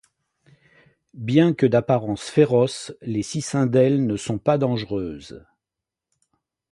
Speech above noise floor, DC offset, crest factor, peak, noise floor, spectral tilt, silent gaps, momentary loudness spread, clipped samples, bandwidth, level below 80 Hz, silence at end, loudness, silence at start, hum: 66 dB; under 0.1%; 20 dB; -4 dBFS; -87 dBFS; -6.5 dB/octave; none; 13 LU; under 0.1%; 11.5 kHz; -56 dBFS; 1.35 s; -21 LUFS; 1.15 s; none